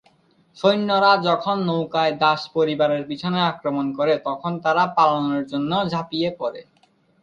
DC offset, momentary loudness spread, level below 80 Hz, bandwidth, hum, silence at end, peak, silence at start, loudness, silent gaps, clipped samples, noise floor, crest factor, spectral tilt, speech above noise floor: under 0.1%; 8 LU; -64 dBFS; 7.4 kHz; none; 0.6 s; -4 dBFS; 0.55 s; -21 LUFS; none; under 0.1%; -60 dBFS; 18 dB; -6.5 dB/octave; 40 dB